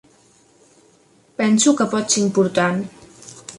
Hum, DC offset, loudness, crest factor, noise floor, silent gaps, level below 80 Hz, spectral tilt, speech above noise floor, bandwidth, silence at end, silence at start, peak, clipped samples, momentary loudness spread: none; under 0.1%; -18 LUFS; 18 dB; -55 dBFS; none; -62 dBFS; -4 dB/octave; 38 dB; 11.5 kHz; 0 s; 1.4 s; -4 dBFS; under 0.1%; 20 LU